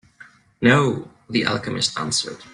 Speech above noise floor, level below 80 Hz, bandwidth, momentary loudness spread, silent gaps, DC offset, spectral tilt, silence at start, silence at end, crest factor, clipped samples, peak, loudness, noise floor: 28 dB; -56 dBFS; 11 kHz; 8 LU; none; under 0.1%; -4 dB/octave; 0.2 s; 0.05 s; 20 dB; under 0.1%; -2 dBFS; -21 LUFS; -49 dBFS